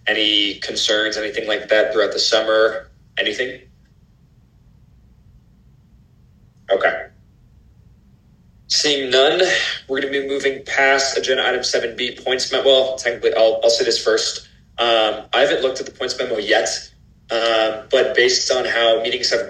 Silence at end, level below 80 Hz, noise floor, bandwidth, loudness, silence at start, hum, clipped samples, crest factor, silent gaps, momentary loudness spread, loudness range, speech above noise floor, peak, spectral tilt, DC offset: 0 s; -54 dBFS; -52 dBFS; 12 kHz; -17 LUFS; 0.05 s; none; under 0.1%; 18 dB; none; 9 LU; 10 LU; 34 dB; -2 dBFS; -1 dB/octave; under 0.1%